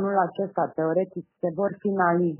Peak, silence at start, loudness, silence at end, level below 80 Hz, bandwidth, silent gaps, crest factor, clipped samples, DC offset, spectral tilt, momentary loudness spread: -8 dBFS; 0 s; -26 LUFS; 0 s; -74 dBFS; 3.1 kHz; none; 18 dB; under 0.1%; under 0.1%; -7.5 dB/octave; 8 LU